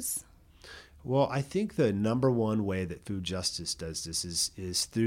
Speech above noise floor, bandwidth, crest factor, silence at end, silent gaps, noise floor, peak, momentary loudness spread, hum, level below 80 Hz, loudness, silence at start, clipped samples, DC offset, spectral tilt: 21 dB; 16.5 kHz; 16 dB; 0 s; none; -52 dBFS; -14 dBFS; 9 LU; none; -56 dBFS; -31 LUFS; 0 s; under 0.1%; under 0.1%; -4.5 dB/octave